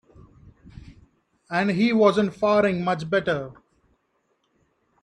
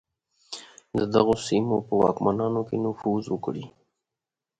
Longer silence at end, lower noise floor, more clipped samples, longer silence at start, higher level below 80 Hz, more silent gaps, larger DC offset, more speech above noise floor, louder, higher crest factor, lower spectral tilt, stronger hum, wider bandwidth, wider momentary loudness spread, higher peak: first, 1.5 s vs 0.9 s; second, -71 dBFS vs -88 dBFS; neither; first, 0.75 s vs 0.5 s; about the same, -58 dBFS vs -58 dBFS; neither; neither; second, 49 dB vs 64 dB; first, -22 LUFS vs -25 LUFS; about the same, 22 dB vs 20 dB; about the same, -7 dB/octave vs -6.5 dB/octave; neither; about the same, 10 kHz vs 9.2 kHz; second, 10 LU vs 17 LU; about the same, -4 dBFS vs -6 dBFS